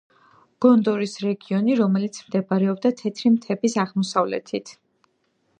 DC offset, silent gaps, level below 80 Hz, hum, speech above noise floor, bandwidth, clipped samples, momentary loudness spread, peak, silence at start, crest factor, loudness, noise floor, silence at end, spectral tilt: under 0.1%; none; -74 dBFS; none; 47 dB; 9.4 kHz; under 0.1%; 9 LU; -4 dBFS; 0.6 s; 18 dB; -22 LUFS; -68 dBFS; 0.85 s; -6.5 dB/octave